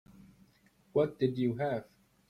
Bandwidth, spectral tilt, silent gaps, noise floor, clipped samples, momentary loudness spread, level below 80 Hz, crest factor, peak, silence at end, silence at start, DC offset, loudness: 13.5 kHz; -9 dB/octave; none; -67 dBFS; under 0.1%; 5 LU; -68 dBFS; 18 dB; -16 dBFS; 0.45 s; 0.95 s; under 0.1%; -33 LUFS